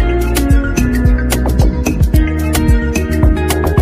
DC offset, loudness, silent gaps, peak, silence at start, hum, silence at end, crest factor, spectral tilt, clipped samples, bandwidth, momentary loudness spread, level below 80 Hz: under 0.1%; -14 LUFS; none; 0 dBFS; 0 s; none; 0 s; 10 dB; -6 dB/octave; under 0.1%; 15.5 kHz; 2 LU; -14 dBFS